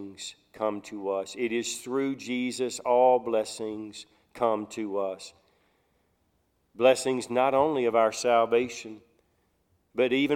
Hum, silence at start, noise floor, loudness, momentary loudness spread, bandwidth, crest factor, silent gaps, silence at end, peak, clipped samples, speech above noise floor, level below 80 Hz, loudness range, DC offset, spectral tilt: none; 0 s; -71 dBFS; -27 LUFS; 17 LU; 16 kHz; 18 dB; none; 0 s; -10 dBFS; under 0.1%; 45 dB; -72 dBFS; 6 LU; under 0.1%; -4 dB/octave